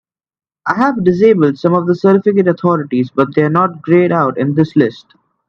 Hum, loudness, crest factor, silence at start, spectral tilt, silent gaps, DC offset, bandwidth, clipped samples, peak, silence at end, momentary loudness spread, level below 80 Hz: none; -13 LUFS; 12 dB; 0.65 s; -9 dB/octave; none; under 0.1%; 6.6 kHz; under 0.1%; 0 dBFS; 0.5 s; 5 LU; -56 dBFS